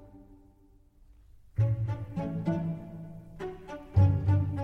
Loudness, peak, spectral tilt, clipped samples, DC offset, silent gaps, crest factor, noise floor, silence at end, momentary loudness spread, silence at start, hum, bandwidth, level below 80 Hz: -30 LUFS; -12 dBFS; -10 dB/octave; under 0.1%; under 0.1%; none; 18 dB; -60 dBFS; 0 s; 19 LU; 0 s; none; 3.7 kHz; -48 dBFS